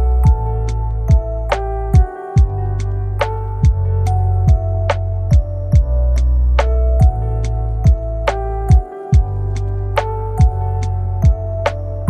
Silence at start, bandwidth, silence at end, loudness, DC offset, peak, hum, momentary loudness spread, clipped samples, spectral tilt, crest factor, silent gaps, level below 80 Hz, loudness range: 0 s; 8.6 kHz; 0 s; -17 LUFS; under 0.1%; 0 dBFS; none; 6 LU; under 0.1%; -7.5 dB/octave; 14 dB; none; -16 dBFS; 2 LU